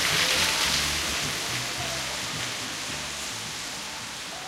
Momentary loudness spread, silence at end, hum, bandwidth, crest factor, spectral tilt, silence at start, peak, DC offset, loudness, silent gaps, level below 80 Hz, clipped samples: 11 LU; 0 s; none; 16 kHz; 20 dB; -1 dB/octave; 0 s; -10 dBFS; under 0.1%; -26 LUFS; none; -48 dBFS; under 0.1%